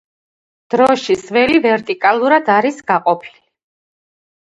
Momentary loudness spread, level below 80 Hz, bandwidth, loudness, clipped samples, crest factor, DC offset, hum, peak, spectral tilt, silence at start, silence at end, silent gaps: 5 LU; -58 dBFS; 11 kHz; -14 LUFS; under 0.1%; 16 dB; under 0.1%; none; 0 dBFS; -5 dB/octave; 0.7 s; 1.1 s; none